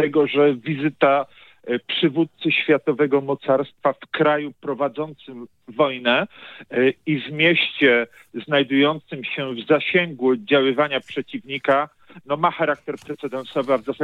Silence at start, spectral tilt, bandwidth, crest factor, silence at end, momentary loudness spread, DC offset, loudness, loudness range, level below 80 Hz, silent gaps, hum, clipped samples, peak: 0 s; -7 dB/octave; 7.4 kHz; 20 dB; 0 s; 13 LU; under 0.1%; -21 LUFS; 3 LU; -72 dBFS; none; none; under 0.1%; -2 dBFS